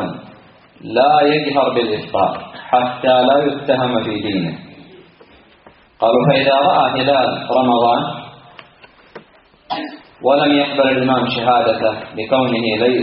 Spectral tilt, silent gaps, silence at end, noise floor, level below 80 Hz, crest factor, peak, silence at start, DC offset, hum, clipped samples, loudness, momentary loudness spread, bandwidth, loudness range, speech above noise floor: -3.5 dB/octave; none; 0 s; -49 dBFS; -56 dBFS; 16 dB; 0 dBFS; 0 s; under 0.1%; none; under 0.1%; -15 LUFS; 13 LU; 5.4 kHz; 3 LU; 34 dB